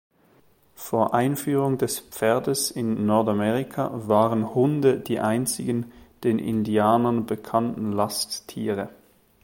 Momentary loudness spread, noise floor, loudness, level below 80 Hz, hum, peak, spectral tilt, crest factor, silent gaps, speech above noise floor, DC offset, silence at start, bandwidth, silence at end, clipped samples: 8 LU; -59 dBFS; -24 LUFS; -60 dBFS; none; -6 dBFS; -5.5 dB/octave; 18 dB; none; 36 dB; under 0.1%; 0.8 s; 17 kHz; 0.55 s; under 0.1%